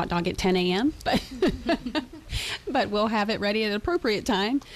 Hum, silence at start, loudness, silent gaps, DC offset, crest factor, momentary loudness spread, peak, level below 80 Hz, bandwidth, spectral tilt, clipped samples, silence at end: none; 0 s; -26 LUFS; none; under 0.1%; 12 dB; 6 LU; -12 dBFS; -44 dBFS; 14.5 kHz; -5 dB/octave; under 0.1%; 0 s